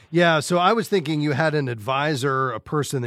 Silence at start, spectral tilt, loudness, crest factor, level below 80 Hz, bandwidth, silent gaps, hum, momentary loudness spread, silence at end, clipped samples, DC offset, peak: 0.1 s; -5.5 dB/octave; -21 LUFS; 16 dB; -62 dBFS; 15.5 kHz; none; none; 6 LU; 0 s; under 0.1%; under 0.1%; -4 dBFS